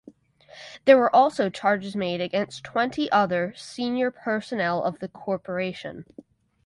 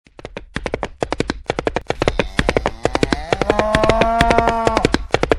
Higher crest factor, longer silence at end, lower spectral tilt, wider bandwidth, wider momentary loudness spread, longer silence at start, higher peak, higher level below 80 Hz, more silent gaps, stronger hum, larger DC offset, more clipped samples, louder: about the same, 22 dB vs 18 dB; first, 0.65 s vs 0 s; about the same, -5.5 dB/octave vs -5 dB/octave; second, 11.5 kHz vs 13.5 kHz; first, 15 LU vs 11 LU; first, 0.55 s vs 0.2 s; second, -4 dBFS vs 0 dBFS; second, -66 dBFS vs -28 dBFS; neither; neither; neither; second, under 0.1% vs 0.2%; second, -24 LUFS vs -18 LUFS